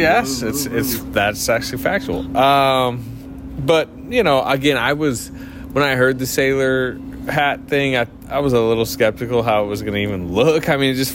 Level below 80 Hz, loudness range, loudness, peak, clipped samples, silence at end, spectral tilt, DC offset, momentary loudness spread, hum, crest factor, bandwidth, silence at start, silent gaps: -40 dBFS; 1 LU; -18 LUFS; -4 dBFS; under 0.1%; 0 s; -4.5 dB/octave; under 0.1%; 8 LU; none; 14 dB; 16.5 kHz; 0 s; none